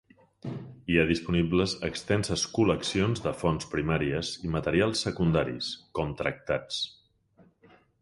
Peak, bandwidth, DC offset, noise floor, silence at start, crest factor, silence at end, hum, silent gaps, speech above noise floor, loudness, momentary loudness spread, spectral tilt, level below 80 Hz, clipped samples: -8 dBFS; 11.5 kHz; under 0.1%; -62 dBFS; 0.45 s; 22 dB; 1.1 s; none; none; 34 dB; -28 LUFS; 8 LU; -5 dB/octave; -48 dBFS; under 0.1%